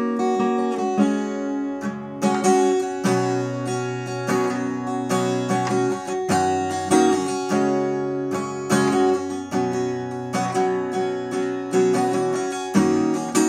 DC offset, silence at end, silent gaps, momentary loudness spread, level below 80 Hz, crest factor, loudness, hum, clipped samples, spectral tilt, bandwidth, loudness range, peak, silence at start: under 0.1%; 0 s; none; 7 LU; -70 dBFS; 18 dB; -22 LUFS; none; under 0.1%; -5.5 dB/octave; 14.5 kHz; 2 LU; -4 dBFS; 0 s